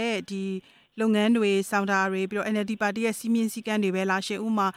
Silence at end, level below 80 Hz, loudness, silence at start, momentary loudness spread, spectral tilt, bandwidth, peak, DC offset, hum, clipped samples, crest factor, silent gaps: 0.05 s; -72 dBFS; -26 LUFS; 0 s; 9 LU; -5 dB/octave; 15.5 kHz; -10 dBFS; under 0.1%; none; under 0.1%; 16 dB; none